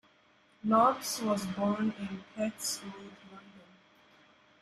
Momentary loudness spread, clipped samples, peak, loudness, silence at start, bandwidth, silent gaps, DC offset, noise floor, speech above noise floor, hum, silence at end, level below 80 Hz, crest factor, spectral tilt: 24 LU; under 0.1%; -14 dBFS; -31 LUFS; 0.65 s; 14.5 kHz; none; under 0.1%; -65 dBFS; 34 dB; none; 1 s; -72 dBFS; 20 dB; -4.5 dB/octave